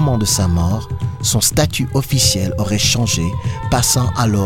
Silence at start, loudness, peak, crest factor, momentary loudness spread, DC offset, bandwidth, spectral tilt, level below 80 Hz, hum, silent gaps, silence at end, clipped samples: 0 s; -16 LUFS; 0 dBFS; 14 dB; 6 LU; under 0.1%; 17 kHz; -4 dB/octave; -30 dBFS; none; none; 0 s; under 0.1%